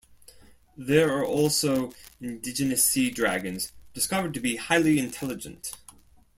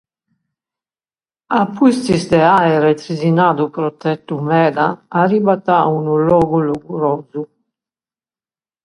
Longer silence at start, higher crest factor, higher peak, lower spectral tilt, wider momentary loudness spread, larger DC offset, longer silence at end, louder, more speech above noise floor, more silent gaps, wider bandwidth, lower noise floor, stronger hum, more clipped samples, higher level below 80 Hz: second, 0.8 s vs 1.5 s; about the same, 20 dB vs 16 dB; second, -8 dBFS vs 0 dBFS; second, -3.5 dB/octave vs -7 dB/octave; first, 16 LU vs 9 LU; neither; second, 0.6 s vs 1.4 s; second, -25 LUFS vs -15 LUFS; second, 28 dB vs over 76 dB; neither; first, 16.5 kHz vs 11.5 kHz; second, -53 dBFS vs under -90 dBFS; neither; neither; second, -58 dBFS vs -52 dBFS